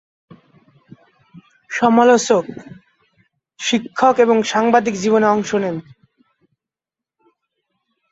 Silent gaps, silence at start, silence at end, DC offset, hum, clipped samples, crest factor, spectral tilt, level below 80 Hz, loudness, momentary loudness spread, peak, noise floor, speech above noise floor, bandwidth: none; 1.35 s; 2.3 s; under 0.1%; none; under 0.1%; 18 dB; -4.5 dB/octave; -62 dBFS; -16 LUFS; 13 LU; -2 dBFS; -88 dBFS; 73 dB; 8 kHz